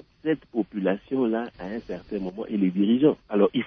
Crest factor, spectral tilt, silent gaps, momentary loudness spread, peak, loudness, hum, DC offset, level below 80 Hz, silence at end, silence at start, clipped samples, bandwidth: 18 dB; -9.5 dB/octave; none; 12 LU; -8 dBFS; -26 LUFS; none; under 0.1%; -60 dBFS; 0 s; 0.25 s; under 0.1%; 5.4 kHz